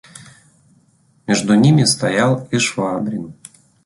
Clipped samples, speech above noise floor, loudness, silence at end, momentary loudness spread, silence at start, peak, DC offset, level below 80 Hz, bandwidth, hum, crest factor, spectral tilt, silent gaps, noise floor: under 0.1%; 41 dB; -16 LUFS; 0.55 s; 15 LU; 0.15 s; -2 dBFS; under 0.1%; -54 dBFS; 12 kHz; none; 16 dB; -5 dB/octave; none; -56 dBFS